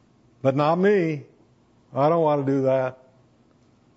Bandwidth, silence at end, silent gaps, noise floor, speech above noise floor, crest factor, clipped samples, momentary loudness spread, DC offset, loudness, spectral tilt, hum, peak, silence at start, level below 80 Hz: 7.8 kHz; 1 s; none; -59 dBFS; 38 dB; 18 dB; under 0.1%; 10 LU; under 0.1%; -22 LUFS; -8.5 dB/octave; none; -6 dBFS; 0.45 s; -70 dBFS